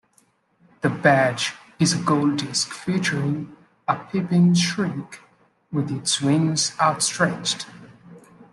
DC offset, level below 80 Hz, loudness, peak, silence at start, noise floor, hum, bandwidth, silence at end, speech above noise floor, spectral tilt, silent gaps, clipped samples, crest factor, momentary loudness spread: under 0.1%; -62 dBFS; -22 LUFS; -2 dBFS; 0.85 s; -62 dBFS; none; 12.5 kHz; 0.1 s; 41 dB; -4.5 dB/octave; none; under 0.1%; 20 dB; 11 LU